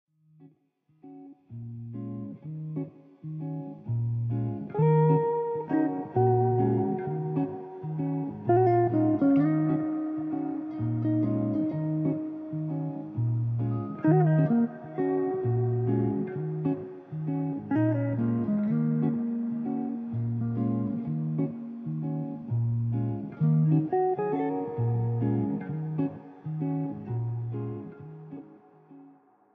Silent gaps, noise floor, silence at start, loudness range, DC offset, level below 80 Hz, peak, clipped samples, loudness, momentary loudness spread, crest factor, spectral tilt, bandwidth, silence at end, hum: none; -68 dBFS; 0.4 s; 8 LU; under 0.1%; -64 dBFS; -12 dBFS; under 0.1%; -28 LUFS; 14 LU; 16 dB; -11.5 dB/octave; 3.5 kHz; 0.45 s; none